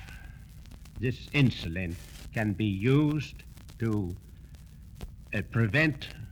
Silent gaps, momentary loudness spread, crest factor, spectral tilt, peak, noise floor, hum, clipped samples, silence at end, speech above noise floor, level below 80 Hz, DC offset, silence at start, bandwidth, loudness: none; 24 LU; 18 dB; -7 dB/octave; -12 dBFS; -48 dBFS; none; under 0.1%; 0 s; 20 dB; -48 dBFS; under 0.1%; 0 s; 18 kHz; -29 LUFS